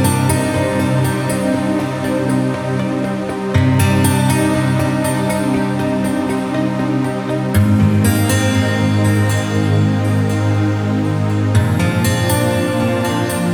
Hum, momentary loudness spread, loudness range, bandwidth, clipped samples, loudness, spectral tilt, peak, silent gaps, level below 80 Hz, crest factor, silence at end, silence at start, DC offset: none; 5 LU; 2 LU; 19 kHz; under 0.1%; -16 LUFS; -6 dB/octave; -2 dBFS; none; -40 dBFS; 14 dB; 0 s; 0 s; under 0.1%